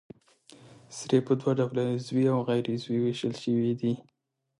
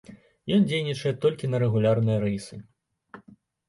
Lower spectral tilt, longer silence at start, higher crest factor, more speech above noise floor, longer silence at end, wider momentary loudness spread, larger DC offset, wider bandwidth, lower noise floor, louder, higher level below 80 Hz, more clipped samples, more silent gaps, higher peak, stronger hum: about the same, -7 dB/octave vs -7 dB/octave; first, 0.5 s vs 0.1 s; about the same, 18 dB vs 16 dB; about the same, 30 dB vs 31 dB; about the same, 0.6 s vs 0.5 s; second, 6 LU vs 15 LU; neither; about the same, 11.5 kHz vs 11.5 kHz; about the same, -57 dBFS vs -55 dBFS; second, -28 LUFS vs -25 LUFS; second, -70 dBFS vs -58 dBFS; neither; neither; about the same, -10 dBFS vs -10 dBFS; neither